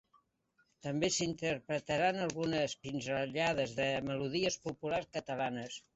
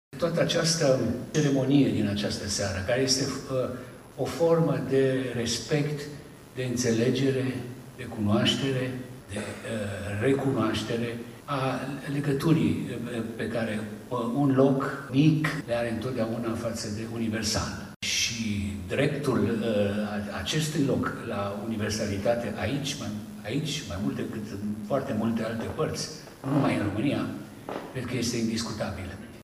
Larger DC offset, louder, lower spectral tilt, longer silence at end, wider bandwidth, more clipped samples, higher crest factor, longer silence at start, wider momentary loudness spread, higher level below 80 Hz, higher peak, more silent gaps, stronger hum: neither; second, -35 LUFS vs -28 LUFS; about the same, -4 dB/octave vs -5 dB/octave; first, 0.15 s vs 0 s; second, 8.2 kHz vs 15.5 kHz; neither; about the same, 18 dB vs 18 dB; first, 0.85 s vs 0.1 s; second, 7 LU vs 11 LU; second, -66 dBFS vs -54 dBFS; second, -20 dBFS vs -10 dBFS; second, none vs 17.96-18.00 s; neither